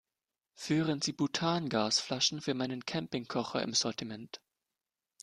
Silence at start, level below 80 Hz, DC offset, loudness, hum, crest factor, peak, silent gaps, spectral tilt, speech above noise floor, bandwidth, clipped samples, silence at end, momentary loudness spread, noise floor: 0.6 s; -72 dBFS; under 0.1%; -32 LUFS; none; 20 dB; -14 dBFS; none; -3.5 dB/octave; over 57 dB; 12.5 kHz; under 0.1%; 0.85 s; 13 LU; under -90 dBFS